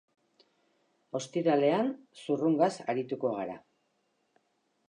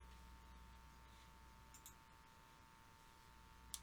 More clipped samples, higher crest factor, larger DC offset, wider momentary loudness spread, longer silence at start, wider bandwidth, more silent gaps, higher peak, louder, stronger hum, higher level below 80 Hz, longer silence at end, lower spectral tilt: neither; second, 20 dB vs 34 dB; neither; first, 14 LU vs 5 LU; first, 1.15 s vs 0 s; second, 10.5 kHz vs over 20 kHz; neither; first, -14 dBFS vs -28 dBFS; first, -30 LUFS vs -63 LUFS; neither; second, -84 dBFS vs -66 dBFS; first, 1.3 s vs 0 s; first, -6 dB/octave vs -2.5 dB/octave